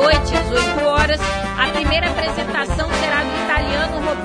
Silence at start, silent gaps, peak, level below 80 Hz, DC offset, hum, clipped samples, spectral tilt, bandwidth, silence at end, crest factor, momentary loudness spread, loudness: 0 s; none; -2 dBFS; -26 dBFS; 0.1%; none; under 0.1%; -4.5 dB/octave; 10.5 kHz; 0 s; 16 dB; 4 LU; -18 LUFS